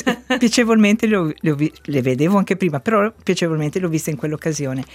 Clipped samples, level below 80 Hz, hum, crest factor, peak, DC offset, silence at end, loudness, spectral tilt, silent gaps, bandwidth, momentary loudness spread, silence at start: under 0.1%; -54 dBFS; none; 16 dB; -2 dBFS; under 0.1%; 0 s; -18 LUFS; -5.5 dB/octave; none; 16 kHz; 8 LU; 0 s